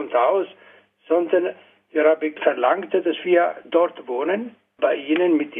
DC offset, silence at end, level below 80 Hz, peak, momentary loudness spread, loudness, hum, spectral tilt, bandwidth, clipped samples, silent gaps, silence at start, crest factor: under 0.1%; 0 s; -80 dBFS; -2 dBFS; 7 LU; -21 LUFS; none; -7 dB/octave; 3.7 kHz; under 0.1%; none; 0 s; 18 dB